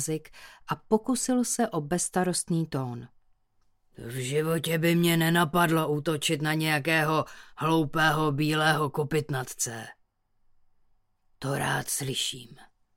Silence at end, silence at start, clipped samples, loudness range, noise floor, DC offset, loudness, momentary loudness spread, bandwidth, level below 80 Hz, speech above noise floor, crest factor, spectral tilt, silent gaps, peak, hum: 0.35 s; 0 s; under 0.1%; 7 LU; -68 dBFS; under 0.1%; -27 LUFS; 12 LU; 17 kHz; -58 dBFS; 41 dB; 18 dB; -4.5 dB/octave; none; -10 dBFS; none